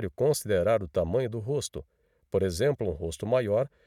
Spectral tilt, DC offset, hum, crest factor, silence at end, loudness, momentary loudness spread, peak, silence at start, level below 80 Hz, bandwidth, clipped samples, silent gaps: -5.5 dB/octave; under 0.1%; none; 14 dB; 0.2 s; -28 LUFS; 7 LU; -14 dBFS; 0 s; -50 dBFS; 16 kHz; under 0.1%; none